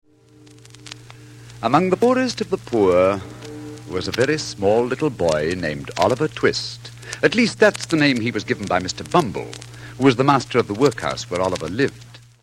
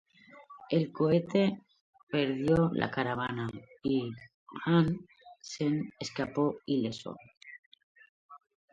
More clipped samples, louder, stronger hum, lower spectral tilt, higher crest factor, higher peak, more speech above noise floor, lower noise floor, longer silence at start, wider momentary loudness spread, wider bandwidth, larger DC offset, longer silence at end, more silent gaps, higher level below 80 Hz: neither; first, -20 LUFS vs -31 LUFS; neither; second, -5 dB/octave vs -7 dB/octave; about the same, 18 dB vs 22 dB; first, -2 dBFS vs -10 dBFS; first, 30 dB vs 24 dB; second, -49 dBFS vs -55 dBFS; first, 0.85 s vs 0.35 s; second, 18 LU vs 22 LU; first, 15 kHz vs 7.8 kHz; neither; about the same, 0.25 s vs 0.35 s; second, none vs 1.81-1.93 s, 2.03-2.07 s, 4.34-4.46 s, 7.37-7.41 s, 7.59-7.72 s, 7.83-7.95 s, 8.09-8.29 s; first, -52 dBFS vs -62 dBFS